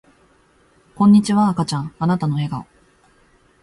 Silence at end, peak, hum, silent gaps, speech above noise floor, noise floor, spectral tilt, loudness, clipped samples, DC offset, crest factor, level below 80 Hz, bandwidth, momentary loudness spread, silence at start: 1 s; -4 dBFS; none; none; 39 dB; -56 dBFS; -7 dB/octave; -18 LUFS; under 0.1%; under 0.1%; 16 dB; -54 dBFS; 11.5 kHz; 11 LU; 1 s